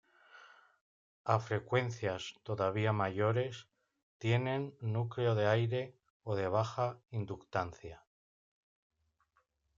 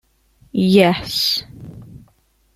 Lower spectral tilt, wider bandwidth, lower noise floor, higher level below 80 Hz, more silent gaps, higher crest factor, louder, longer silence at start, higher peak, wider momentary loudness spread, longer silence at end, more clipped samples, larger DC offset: first, -7 dB/octave vs -5.5 dB/octave; second, 7.6 kHz vs 15.5 kHz; first, -78 dBFS vs -58 dBFS; second, -72 dBFS vs -50 dBFS; first, 0.81-1.25 s, 4.03-4.20 s, 6.10-6.20 s vs none; about the same, 22 dB vs 18 dB; second, -35 LUFS vs -16 LUFS; second, 0.35 s vs 0.55 s; second, -14 dBFS vs -2 dBFS; second, 11 LU vs 25 LU; first, 1.8 s vs 0.6 s; neither; neither